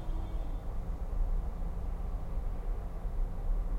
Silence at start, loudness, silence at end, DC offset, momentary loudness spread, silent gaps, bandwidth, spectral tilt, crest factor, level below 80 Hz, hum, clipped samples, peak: 0 s; -40 LUFS; 0 s; under 0.1%; 3 LU; none; 3.8 kHz; -8 dB/octave; 12 dB; -34 dBFS; none; under 0.1%; -22 dBFS